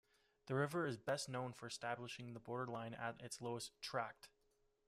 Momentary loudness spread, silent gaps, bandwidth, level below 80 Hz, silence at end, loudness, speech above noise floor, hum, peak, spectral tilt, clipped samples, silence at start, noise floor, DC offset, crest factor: 9 LU; none; 15 kHz; -80 dBFS; 0.6 s; -46 LUFS; 35 dB; none; -26 dBFS; -4.5 dB/octave; under 0.1%; 0.45 s; -80 dBFS; under 0.1%; 20 dB